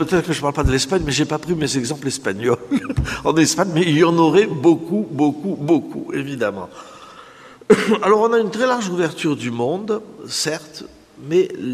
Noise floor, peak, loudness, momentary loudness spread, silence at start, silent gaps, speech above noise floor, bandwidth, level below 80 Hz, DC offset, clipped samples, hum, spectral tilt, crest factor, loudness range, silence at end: -42 dBFS; 0 dBFS; -19 LUFS; 11 LU; 0 s; none; 24 dB; 14.5 kHz; -38 dBFS; under 0.1%; under 0.1%; none; -5 dB/octave; 18 dB; 4 LU; 0 s